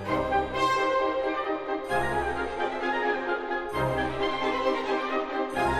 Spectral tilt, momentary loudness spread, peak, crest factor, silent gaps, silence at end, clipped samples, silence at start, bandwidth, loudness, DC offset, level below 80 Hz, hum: -5 dB/octave; 5 LU; -12 dBFS; 14 dB; none; 0 s; under 0.1%; 0 s; 14.5 kHz; -28 LUFS; under 0.1%; -48 dBFS; none